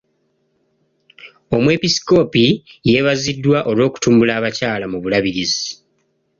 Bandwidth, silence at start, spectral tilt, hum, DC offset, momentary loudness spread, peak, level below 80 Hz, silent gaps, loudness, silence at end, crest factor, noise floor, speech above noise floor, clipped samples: 7.6 kHz; 1.25 s; -5 dB/octave; none; under 0.1%; 7 LU; -2 dBFS; -50 dBFS; none; -16 LUFS; 0.65 s; 16 dB; -65 dBFS; 49 dB; under 0.1%